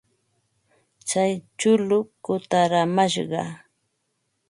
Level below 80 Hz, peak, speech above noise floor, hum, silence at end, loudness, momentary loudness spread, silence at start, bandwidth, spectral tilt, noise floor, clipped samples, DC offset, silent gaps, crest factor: -70 dBFS; -6 dBFS; 52 dB; none; 0.9 s; -22 LUFS; 9 LU; 1.05 s; 11.5 kHz; -4.5 dB/octave; -74 dBFS; under 0.1%; under 0.1%; none; 18 dB